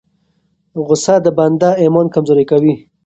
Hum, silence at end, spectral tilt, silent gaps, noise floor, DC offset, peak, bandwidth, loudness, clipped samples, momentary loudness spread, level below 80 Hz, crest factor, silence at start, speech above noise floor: none; 0.3 s; -6.5 dB/octave; none; -61 dBFS; under 0.1%; 0 dBFS; 8.2 kHz; -12 LUFS; under 0.1%; 5 LU; -54 dBFS; 12 dB; 0.75 s; 50 dB